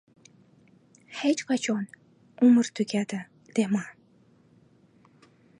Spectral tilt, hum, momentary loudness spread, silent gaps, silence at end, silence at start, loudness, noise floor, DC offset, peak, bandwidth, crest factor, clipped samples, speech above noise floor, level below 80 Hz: -5 dB/octave; none; 18 LU; none; 1.7 s; 1.1 s; -26 LUFS; -60 dBFS; under 0.1%; -10 dBFS; 11 kHz; 18 dB; under 0.1%; 36 dB; -78 dBFS